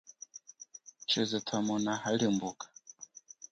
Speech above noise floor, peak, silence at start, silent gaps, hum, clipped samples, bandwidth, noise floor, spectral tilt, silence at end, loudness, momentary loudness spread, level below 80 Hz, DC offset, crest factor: 22 dB; -18 dBFS; 0.05 s; none; none; under 0.1%; 8.8 kHz; -54 dBFS; -4 dB/octave; 0.45 s; -32 LUFS; 19 LU; -76 dBFS; under 0.1%; 18 dB